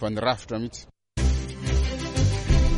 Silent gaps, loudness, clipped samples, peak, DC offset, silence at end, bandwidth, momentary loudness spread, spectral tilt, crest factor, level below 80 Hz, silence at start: none; -26 LUFS; under 0.1%; -8 dBFS; under 0.1%; 0 s; 11 kHz; 11 LU; -5.5 dB/octave; 16 dB; -26 dBFS; 0 s